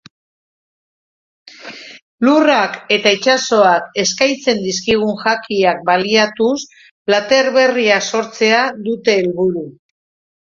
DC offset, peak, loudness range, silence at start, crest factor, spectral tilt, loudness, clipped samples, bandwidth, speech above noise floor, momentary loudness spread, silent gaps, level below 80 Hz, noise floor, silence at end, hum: under 0.1%; 0 dBFS; 2 LU; 1.6 s; 16 dB; -3 dB/octave; -14 LUFS; under 0.1%; 7.6 kHz; 20 dB; 14 LU; 2.02-2.18 s, 6.91-7.05 s; -56 dBFS; -35 dBFS; 0.7 s; none